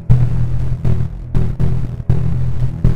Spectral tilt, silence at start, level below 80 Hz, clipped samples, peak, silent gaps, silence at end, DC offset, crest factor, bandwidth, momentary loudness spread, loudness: -10 dB/octave; 0 s; -22 dBFS; under 0.1%; 0 dBFS; none; 0 s; 10%; 16 dB; 5 kHz; 5 LU; -19 LUFS